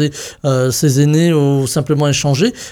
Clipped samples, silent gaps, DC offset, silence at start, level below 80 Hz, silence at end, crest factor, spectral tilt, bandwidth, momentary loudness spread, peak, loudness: under 0.1%; none; under 0.1%; 0 s; -46 dBFS; 0 s; 12 dB; -5.5 dB/octave; 17 kHz; 5 LU; -2 dBFS; -14 LUFS